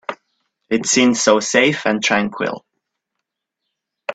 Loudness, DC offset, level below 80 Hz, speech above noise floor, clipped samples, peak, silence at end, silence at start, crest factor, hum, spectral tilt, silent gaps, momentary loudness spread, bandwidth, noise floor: -16 LUFS; under 0.1%; -62 dBFS; 63 dB; under 0.1%; 0 dBFS; 0 s; 0.1 s; 18 dB; none; -3 dB/octave; none; 16 LU; 9.2 kHz; -79 dBFS